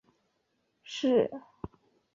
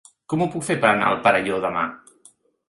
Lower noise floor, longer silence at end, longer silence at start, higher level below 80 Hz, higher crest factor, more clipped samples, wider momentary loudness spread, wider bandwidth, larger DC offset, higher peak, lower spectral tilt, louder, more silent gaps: first, -77 dBFS vs -55 dBFS; about the same, 0.75 s vs 0.7 s; first, 0.85 s vs 0.3 s; about the same, -64 dBFS vs -60 dBFS; about the same, 20 dB vs 22 dB; neither; first, 20 LU vs 9 LU; second, 7.6 kHz vs 11.5 kHz; neither; second, -14 dBFS vs 0 dBFS; about the same, -5.5 dB/octave vs -5 dB/octave; second, -29 LUFS vs -21 LUFS; neither